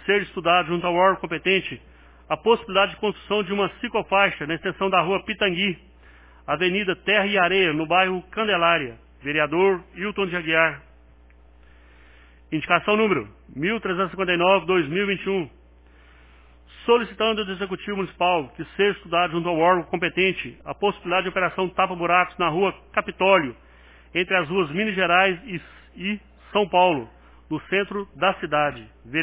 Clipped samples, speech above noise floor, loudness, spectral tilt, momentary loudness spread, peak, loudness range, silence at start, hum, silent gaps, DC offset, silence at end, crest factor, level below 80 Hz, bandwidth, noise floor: under 0.1%; 29 dB; -22 LUFS; -8.5 dB/octave; 11 LU; -2 dBFS; 4 LU; 0 s; none; none; under 0.1%; 0 s; 20 dB; -52 dBFS; 4 kHz; -51 dBFS